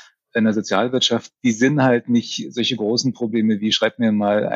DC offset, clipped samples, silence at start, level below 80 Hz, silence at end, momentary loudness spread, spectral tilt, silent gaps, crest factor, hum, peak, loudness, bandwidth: under 0.1%; under 0.1%; 0.35 s; -66 dBFS; 0 s; 5 LU; -4.5 dB/octave; none; 14 dB; none; -4 dBFS; -19 LUFS; 7.8 kHz